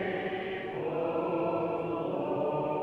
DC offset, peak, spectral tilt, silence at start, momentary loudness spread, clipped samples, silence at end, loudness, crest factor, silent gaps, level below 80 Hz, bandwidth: under 0.1%; -18 dBFS; -8.5 dB/octave; 0 s; 4 LU; under 0.1%; 0 s; -32 LUFS; 14 dB; none; -64 dBFS; 5.8 kHz